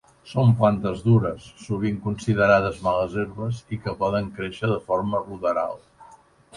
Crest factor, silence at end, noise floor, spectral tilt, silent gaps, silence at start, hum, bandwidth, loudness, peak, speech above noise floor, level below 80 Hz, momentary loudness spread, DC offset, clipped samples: 18 dB; 0 s; -51 dBFS; -8 dB/octave; none; 0.25 s; none; 11 kHz; -23 LUFS; -4 dBFS; 29 dB; -48 dBFS; 12 LU; under 0.1%; under 0.1%